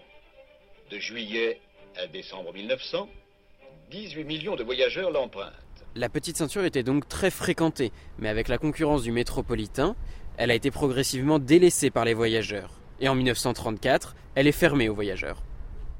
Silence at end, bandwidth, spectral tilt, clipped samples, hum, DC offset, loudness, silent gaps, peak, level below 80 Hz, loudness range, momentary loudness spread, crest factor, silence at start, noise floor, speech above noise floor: 0 s; 16.5 kHz; -4.5 dB/octave; under 0.1%; none; under 0.1%; -26 LUFS; none; -6 dBFS; -42 dBFS; 10 LU; 17 LU; 20 dB; 0.15 s; -55 dBFS; 29 dB